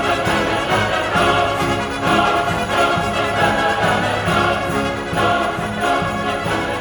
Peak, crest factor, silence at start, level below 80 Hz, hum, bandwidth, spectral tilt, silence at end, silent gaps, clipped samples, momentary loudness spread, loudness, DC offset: -2 dBFS; 16 dB; 0 s; -38 dBFS; none; 19.5 kHz; -4.5 dB/octave; 0 s; none; under 0.1%; 5 LU; -17 LUFS; under 0.1%